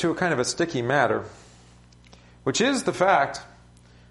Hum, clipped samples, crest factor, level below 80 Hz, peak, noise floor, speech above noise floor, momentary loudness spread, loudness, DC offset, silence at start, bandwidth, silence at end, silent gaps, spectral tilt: 60 Hz at -50 dBFS; under 0.1%; 20 dB; -56 dBFS; -6 dBFS; -52 dBFS; 29 dB; 10 LU; -23 LUFS; under 0.1%; 0 s; 11.5 kHz; 0.65 s; none; -4 dB/octave